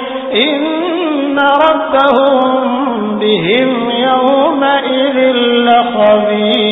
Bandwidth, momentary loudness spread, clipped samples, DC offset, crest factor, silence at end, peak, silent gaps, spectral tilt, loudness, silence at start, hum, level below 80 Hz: 4 kHz; 5 LU; under 0.1%; under 0.1%; 10 dB; 0 s; 0 dBFS; none; -7.5 dB/octave; -11 LUFS; 0 s; none; -52 dBFS